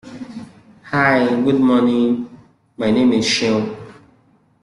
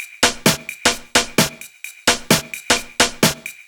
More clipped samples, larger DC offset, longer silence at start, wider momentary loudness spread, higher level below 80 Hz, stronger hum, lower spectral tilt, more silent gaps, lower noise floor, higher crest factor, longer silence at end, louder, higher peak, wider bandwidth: neither; neither; about the same, 0.05 s vs 0 s; first, 19 LU vs 5 LU; second, -56 dBFS vs -44 dBFS; neither; first, -5 dB/octave vs -2 dB/octave; neither; first, -55 dBFS vs -37 dBFS; about the same, 16 dB vs 18 dB; first, 0.7 s vs 0.15 s; about the same, -16 LUFS vs -17 LUFS; about the same, -2 dBFS vs -2 dBFS; second, 11 kHz vs over 20 kHz